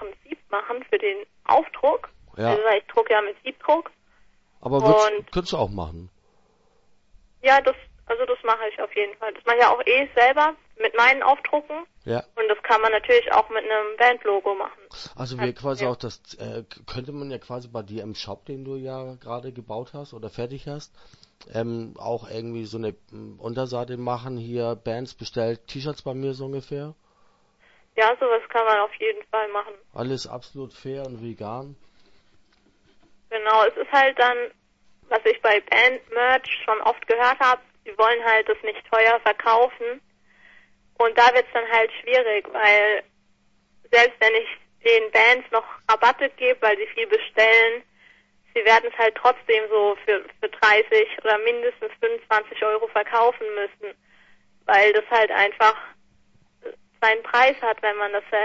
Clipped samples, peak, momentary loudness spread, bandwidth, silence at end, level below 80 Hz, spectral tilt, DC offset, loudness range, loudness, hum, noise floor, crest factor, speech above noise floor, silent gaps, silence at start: under 0.1%; -2 dBFS; 18 LU; 7.8 kHz; 0 s; -56 dBFS; -4.5 dB/octave; under 0.1%; 14 LU; -20 LUFS; none; -63 dBFS; 20 dB; 42 dB; none; 0 s